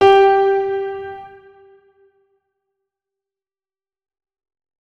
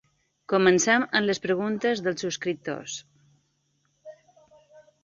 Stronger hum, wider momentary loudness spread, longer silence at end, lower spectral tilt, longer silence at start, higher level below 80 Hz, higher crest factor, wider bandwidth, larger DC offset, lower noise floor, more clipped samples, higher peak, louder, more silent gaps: neither; first, 21 LU vs 13 LU; first, 3.55 s vs 0.25 s; first, -5 dB/octave vs -3.5 dB/octave; second, 0 s vs 0.5 s; first, -56 dBFS vs -70 dBFS; about the same, 18 dB vs 20 dB; second, 6.6 kHz vs 7.8 kHz; neither; first, under -90 dBFS vs -71 dBFS; neither; first, 0 dBFS vs -6 dBFS; first, -15 LUFS vs -24 LUFS; neither